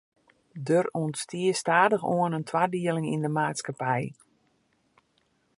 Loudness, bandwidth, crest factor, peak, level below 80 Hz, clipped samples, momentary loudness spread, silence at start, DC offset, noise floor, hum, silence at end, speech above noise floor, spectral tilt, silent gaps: -27 LUFS; 11.5 kHz; 22 dB; -6 dBFS; -74 dBFS; under 0.1%; 9 LU; 0.55 s; under 0.1%; -70 dBFS; none; 1.45 s; 44 dB; -5.5 dB/octave; none